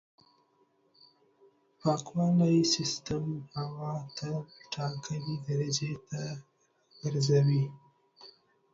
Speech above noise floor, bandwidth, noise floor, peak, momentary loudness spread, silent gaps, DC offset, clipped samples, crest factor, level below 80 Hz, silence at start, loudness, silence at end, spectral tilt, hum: 40 dB; 7.8 kHz; -70 dBFS; -14 dBFS; 13 LU; none; under 0.1%; under 0.1%; 18 dB; -66 dBFS; 1.85 s; -31 LUFS; 0.45 s; -5.5 dB/octave; none